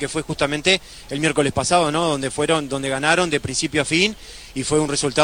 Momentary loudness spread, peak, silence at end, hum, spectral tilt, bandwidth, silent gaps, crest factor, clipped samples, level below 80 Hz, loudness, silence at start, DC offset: 7 LU; 0 dBFS; 0 s; none; -3.5 dB/octave; 16.5 kHz; none; 20 dB; under 0.1%; -44 dBFS; -20 LUFS; 0 s; under 0.1%